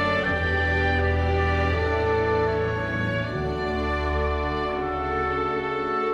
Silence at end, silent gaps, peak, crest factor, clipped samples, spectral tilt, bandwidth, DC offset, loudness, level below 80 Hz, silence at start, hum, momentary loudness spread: 0 s; none; -12 dBFS; 12 dB; under 0.1%; -7 dB/octave; 7.6 kHz; under 0.1%; -24 LUFS; -36 dBFS; 0 s; none; 4 LU